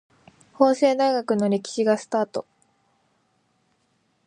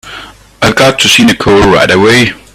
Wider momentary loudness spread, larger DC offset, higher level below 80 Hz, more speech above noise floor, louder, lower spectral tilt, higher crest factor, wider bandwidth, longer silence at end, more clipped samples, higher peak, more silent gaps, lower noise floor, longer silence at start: about the same, 7 LU vs 7 LU; neither; second, -74 dBFS vs -32 dBFS; first, 47 dB vs 23 dB; second, -22 LUFS vs -6 LUFS; first, -5.5 dB/octave vs -4 dB/octave; first, 20 dB vs 8 dB; second, 10.5 kHz vs 17.5 kHz; first, 1.85 s vs 0.2 s; second, under 0.1% vs 0.7%; second, -4 dBFS vs 0 dBFS; neither; first, -68 dBFS vs -29 dBFS; first, 0.6 s vs 0.05 s